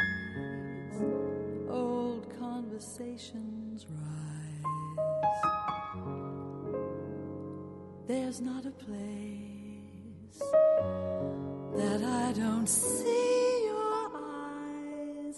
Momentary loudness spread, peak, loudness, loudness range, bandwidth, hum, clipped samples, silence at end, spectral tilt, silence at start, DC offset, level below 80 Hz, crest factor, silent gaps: 15 LU; -14 dBFS; -34 LUFS; 9 LU; 11.5 kHz; none; under 0.1%; 0 s; -5 dB/octave; 0 s; under 0.1%; -66 dBFS; 20 dB; none